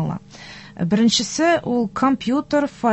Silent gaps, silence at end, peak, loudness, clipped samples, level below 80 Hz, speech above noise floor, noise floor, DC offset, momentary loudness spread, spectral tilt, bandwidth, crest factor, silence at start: none; 0 s; -4 dBFS; -19 LUFS; under 0.1%; -52 dBFS; 21 dB; -40 dBFS; under 0.1%; 18 LU; -4.5 dB/octave; 8.4 kHz; 14 dB; 0 s